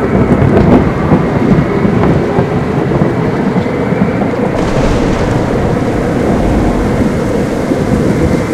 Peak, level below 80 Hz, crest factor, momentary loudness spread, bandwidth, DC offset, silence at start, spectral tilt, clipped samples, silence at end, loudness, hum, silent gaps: 0 dBFS; -22 dBFS; 10 dB; 4 LU; 14 kHz; under 0.1%; 0 s; -8 dB/octave; 0.4%; 0 s; -11 LUFS; none; none